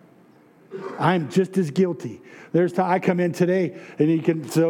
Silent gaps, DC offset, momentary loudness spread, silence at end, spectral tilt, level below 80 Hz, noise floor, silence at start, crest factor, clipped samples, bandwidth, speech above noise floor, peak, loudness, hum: none; under 0.1%; 15 LU; 0 s; -7 dB/octave; -78 dBFS; -53 dBFS; 0.7 s; 16 dB; under 0.1%; 17 kHz; 32 dB; -6 dBFS; -22 LUFS; none